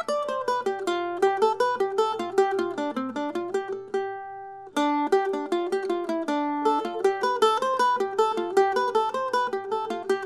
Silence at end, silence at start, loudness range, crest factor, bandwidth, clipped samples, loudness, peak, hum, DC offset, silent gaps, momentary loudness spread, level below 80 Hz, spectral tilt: 0 s; 0 s; 4 LU; 18 dB; 13 kHz; under 0.1%; -26 LUFS; -8 dBFS; none; under 0.1%; none; 7 LU; -74 dBFS; -3.5 dB/octave